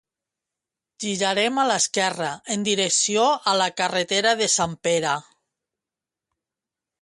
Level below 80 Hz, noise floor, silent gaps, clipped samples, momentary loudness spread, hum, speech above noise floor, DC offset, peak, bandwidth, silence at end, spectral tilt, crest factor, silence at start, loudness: -66 dBFS; -88 dBFS; none; under 0.1%; 7 LU; none; 66 dB; under 0.1%; -6 dBFS; 11.5 kHz; 1.8 s; -2 dB/octave; 18 dB; 1 s; -21 LUFS